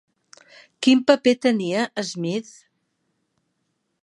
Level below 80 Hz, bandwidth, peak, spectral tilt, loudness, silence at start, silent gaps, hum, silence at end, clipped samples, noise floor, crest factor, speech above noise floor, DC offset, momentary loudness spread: -74 dBFS; 11 kHz; -2 dBFS; -4.5 dB/octave; -21 LUFS; 0.8 s; none; none; 1.6 s; under 0.1%; -74 dBFS; 22 dB; 54 dB; under 0.1%; 11 LU